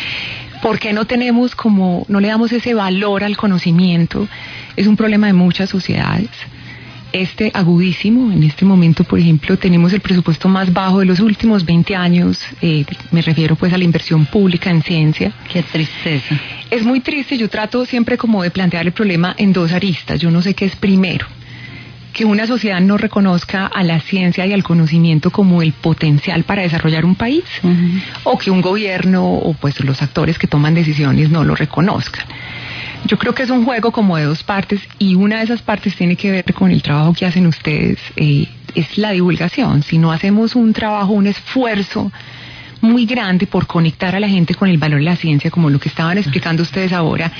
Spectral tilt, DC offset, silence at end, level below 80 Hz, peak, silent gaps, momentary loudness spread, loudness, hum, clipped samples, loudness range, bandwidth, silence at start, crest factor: -8 dB/octave; under 0.1%; 0 s; -42 dBFS; 0 dBFS; none; 7 LU; -14 LUFS; none; under 0.1%; 3 LU; 5.4 kHz; 0 s; 12 dB